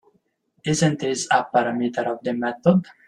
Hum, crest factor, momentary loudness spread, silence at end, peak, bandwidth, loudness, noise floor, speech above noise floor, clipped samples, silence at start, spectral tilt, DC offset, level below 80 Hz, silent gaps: none; 20 dB; 6 LU; 0.25 s; -4 dBFS; 11.5 kHz; -22 LUFS; -66 dBFS; 45 dB; under 0.1%; 0.65 s; -5 dB/octave; under 0.1%; -62 dBFS; none